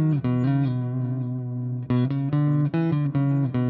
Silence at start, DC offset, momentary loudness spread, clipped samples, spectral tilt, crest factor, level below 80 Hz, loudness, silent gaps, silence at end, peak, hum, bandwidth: 0 s; under 0.1%; 7 LU; under 0.1%; -11.5 dB/octave; 10 dB; -58 dBFS; -24 LUFS; none; 0 s; -12 dBFS; none; 4.5 kHz